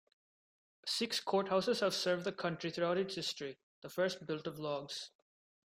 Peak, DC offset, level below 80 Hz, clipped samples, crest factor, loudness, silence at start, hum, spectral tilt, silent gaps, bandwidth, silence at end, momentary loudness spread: -20 dBFS; under 0.1%; -78 dBFS; under 0.1%; 18 dB; -37 LUFS; 0.85 s; none; -4 dB/octave; 3.63-3.82 s; 16 kHz; 0.6 s; 12 LU